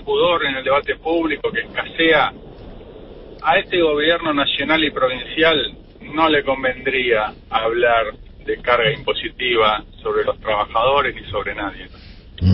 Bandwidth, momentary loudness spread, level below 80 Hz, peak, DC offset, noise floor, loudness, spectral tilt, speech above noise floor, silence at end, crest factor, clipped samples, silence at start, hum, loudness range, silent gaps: 5.8 kHz; 10 LU; -42 dBFS; -2 dBFS; under 0.1%; -37 dBFS; -18 LUFS; -10 dB/octave; 19 dB; 0 s; 16 dB; under 0.1%; 0 s; none; 2 LU; none